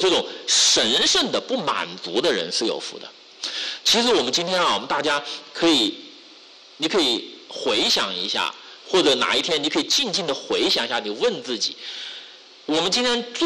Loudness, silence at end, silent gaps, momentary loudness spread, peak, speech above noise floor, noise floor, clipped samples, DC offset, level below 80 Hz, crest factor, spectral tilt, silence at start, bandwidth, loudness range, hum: -20 LUFS; 0 s; none; 15 LU; -10 dBFS; 25 dB; -47 dBFS; under 0.1%; under 0.1%; -60 dBFS; 12 dB; -1.5 dB/octave; 0 s; 14.5 kHz; 3 LU; none